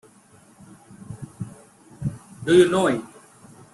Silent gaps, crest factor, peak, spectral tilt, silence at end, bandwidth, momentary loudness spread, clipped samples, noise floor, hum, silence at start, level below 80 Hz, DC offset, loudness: none; 20 dB; -4 dBFS; -6 dB/octave; 0.7 s; 12 kHz; 23 LU; under 0.1%; -53 dBFS; none; 1.1 s; -58 dBFS; under 0.1%; -21 LUFS